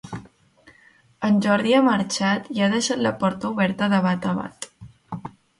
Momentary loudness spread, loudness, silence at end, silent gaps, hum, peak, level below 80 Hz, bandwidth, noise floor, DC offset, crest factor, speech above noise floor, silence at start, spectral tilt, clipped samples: 19 LU; -21 LUFS; 0.3 s; none; none; -4 dBFS; -58 dBFS; 11.5 kHz; -56 dBFS; under 0.1%; 18 dB; 35 dB; 0.05 s; -5 dB/octave; under 0.1%